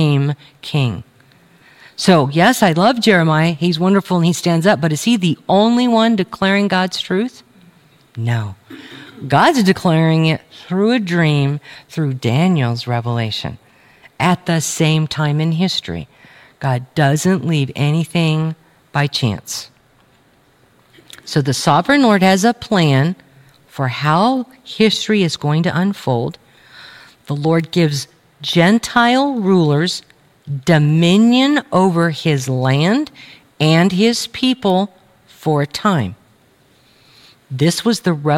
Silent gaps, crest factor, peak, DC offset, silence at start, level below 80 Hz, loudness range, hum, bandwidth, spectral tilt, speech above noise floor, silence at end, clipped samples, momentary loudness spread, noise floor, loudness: none; 16 dB; 0 dBFS; under 0.1%; 0 s; -56 dBFS; 5 LU; none; 16 kHz; -5.5 dB/octave; 38 dB; 0 s; under 0.1%; 13 LU; -53 dBFS; -15 LUFS